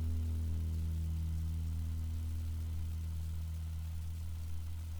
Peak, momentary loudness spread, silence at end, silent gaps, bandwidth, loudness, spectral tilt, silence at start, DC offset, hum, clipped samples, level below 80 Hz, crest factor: -28 dBFS; 5 LU; 0 s; none; 20 kHz; -40 LUFS; -7 dB/octave; 0 s; under 0.1%; none; under 0.1%; -42 dBFS; 10 dB